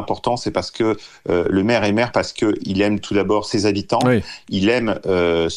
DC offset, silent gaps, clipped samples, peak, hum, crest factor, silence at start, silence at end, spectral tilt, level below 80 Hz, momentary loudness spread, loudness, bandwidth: under 0.1%; none; under 0.1%; -4 dBFS; none; 14 dB; 0 s; 0 s; -5.5 dB/octave; -48 dBFS; 5 LU; -19 LUFS; 11 kHz